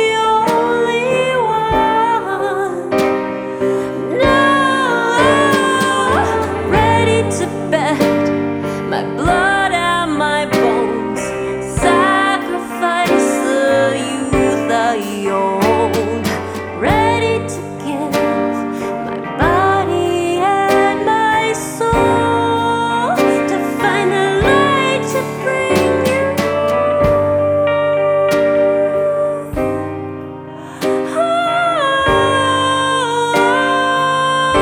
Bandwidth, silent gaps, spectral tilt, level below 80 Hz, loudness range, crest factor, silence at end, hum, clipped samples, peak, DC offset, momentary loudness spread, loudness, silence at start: over 20 kHz; none; -5 dB/octave; -38 dBFS; 3 LU; 14 dB; 0 s; none; under 0.1%; -2 dBFS; under 0.1%; 7 LU; -15 LUFS; 0 s